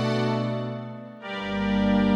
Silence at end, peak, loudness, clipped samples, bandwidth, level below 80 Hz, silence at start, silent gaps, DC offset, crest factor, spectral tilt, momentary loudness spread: 0 s; -10 dBFS; -27 LUFS; under 0.1%; 9.4 kHz; -46 dBFS; 0 s; none; under 0.1%; 14 dB; -7.5 dB/octave; 14 LU